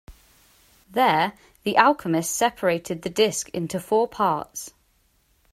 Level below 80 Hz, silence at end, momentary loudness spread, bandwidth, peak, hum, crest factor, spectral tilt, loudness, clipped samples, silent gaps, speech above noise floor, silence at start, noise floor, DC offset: -58 dBFS; 0.85 s; 12 LU; 16 kHz; 0 dBFS; none; 24 dB; -3.5 dB/octave; -23 LUFS; under 0.1%; none; 42 dB; 0.1 s; -64 dBFS; under 0.1%